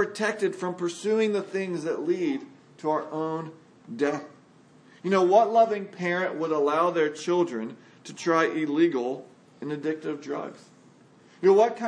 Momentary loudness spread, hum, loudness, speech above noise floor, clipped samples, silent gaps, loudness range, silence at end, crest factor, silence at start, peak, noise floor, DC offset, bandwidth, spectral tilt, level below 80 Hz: 15 LU; none; -26 LUFS; 30 dB; under 0.1%; none; 6 LU; 0 s; 20 dB; 0 s; -6 dBFS; -55 dBFS; under 0.1%; 10.5 kHz; -5.5 dB/octave; -84 dBFS